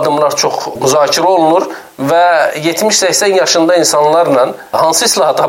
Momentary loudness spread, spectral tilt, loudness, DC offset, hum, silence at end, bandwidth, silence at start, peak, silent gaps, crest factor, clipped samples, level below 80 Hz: 5 LU; -2.5 dB/octave; -10 LUFS; under 0.1%; none; 0 s; 17 kHz; 0 s; 0 dBFS; none; 10 dB; under 0.1%; -58 dBFS